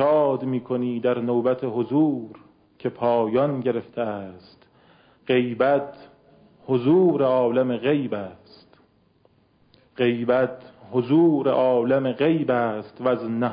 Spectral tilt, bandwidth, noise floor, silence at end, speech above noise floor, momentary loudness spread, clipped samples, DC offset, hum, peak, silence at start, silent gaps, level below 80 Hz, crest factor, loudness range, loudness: -11.5 dB/octave; 5.2 kHz; -61 dBFS; 0 s; 39 dB; 12 LU; under 0.1%; under 0.1%; none; -10 dBFS; 0 s; none; -66 dBFS; 14 dB; 5 LU; -22 LUFS